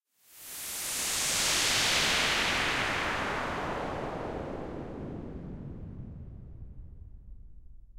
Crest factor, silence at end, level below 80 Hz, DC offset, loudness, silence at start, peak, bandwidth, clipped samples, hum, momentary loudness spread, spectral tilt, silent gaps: 18 dB; 0 s; -48 dBFS; under 0.1%; -29 LUFS; 0.3 s; -14 dBFS; 16 kHz; under 0.1%; none; 23 LU; -1.5 dB/octave; none